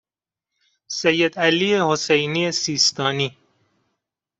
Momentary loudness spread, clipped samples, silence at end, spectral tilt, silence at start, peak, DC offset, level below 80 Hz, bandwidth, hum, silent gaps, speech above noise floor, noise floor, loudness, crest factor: 6 LU; under 0.1%; 1.1 s; -3 dB/octave; 0.9 s; -4 dBFS; under 0.1%; -64 dBFS; 8.2 kHz; none; none; 68 dB; -88 dBFS; -19 LUFS; 18 dB